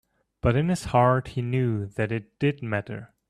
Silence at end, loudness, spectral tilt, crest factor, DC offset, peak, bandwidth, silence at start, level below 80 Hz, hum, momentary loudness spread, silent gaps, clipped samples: 0.25 s; -25 LUFS; -7.5 dB/octave; 18 dB; under 0.1%; -8 dBFS; 12.5 kHz; 0.45 s; -48 dBFS; none; 9 LU; none; under 0.1%